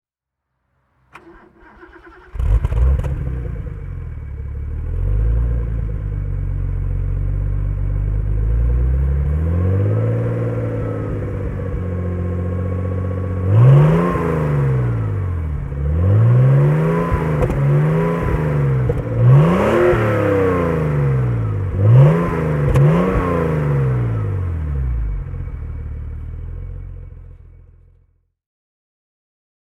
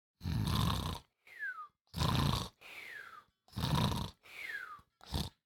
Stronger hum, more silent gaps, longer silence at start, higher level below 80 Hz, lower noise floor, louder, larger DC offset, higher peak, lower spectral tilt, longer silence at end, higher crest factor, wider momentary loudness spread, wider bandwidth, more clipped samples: neither; second, none vs 1.81-1.85 s; first, 1.15 s vs 0.2 s; first, -24 dBFS vs -48 dBFS; first, -80 dBFS vs -58 dBFS; first, -18 LUFS vs -38 LUFS; neither; first, 0 dBFS vs -16 dBFS; first, -9.5 dB/octave vs -5 dB/octave; first, 2.4 s vs 0.15 s; second, 16 dB vs 22 dB; about the same, 16 LU vs 16 LU; second, 6 kHz vs 19 kHz; neither